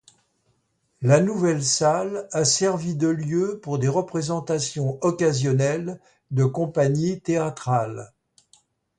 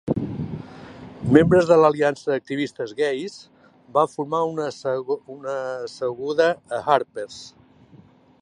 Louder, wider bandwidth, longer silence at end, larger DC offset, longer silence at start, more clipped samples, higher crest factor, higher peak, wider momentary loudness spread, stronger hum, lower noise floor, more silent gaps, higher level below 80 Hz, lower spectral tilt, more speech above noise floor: about the same, -23 LUFS vs -22 LUFS; about the same, 10 kHz vs 11 kHz; about the same, 0.9 s vs 0.95 s; neither; first, 1 s vs 0.05 s; neither; about the same, 20 dB vs 22 dB; second, -4 dBFS vs 0 dBFS; second, 8 LU vs 18 LU; neither; first, -70 dBFS vs -51 dBFS; neither; second, -62 dBFS vs -52 dBFS; second, -5 dB/octave vs -6.5 dB/octave; first, 48 dB vs 30 dB